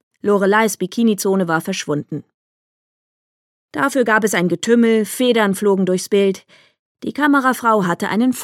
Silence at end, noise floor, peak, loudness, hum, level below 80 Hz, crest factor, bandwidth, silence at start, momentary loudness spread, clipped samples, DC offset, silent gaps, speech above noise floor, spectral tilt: 0 s; under -90 dBFS; -2 dBFS; -17 LUFS; none; -70 dBFS; 16 dB; 16.5 kHz; 0.25 s; 9 LU; under 0.1%; under 0.1%; 2.34-3.69 s, 6.79-6.95 s; over 74 dB; -5 dB/octave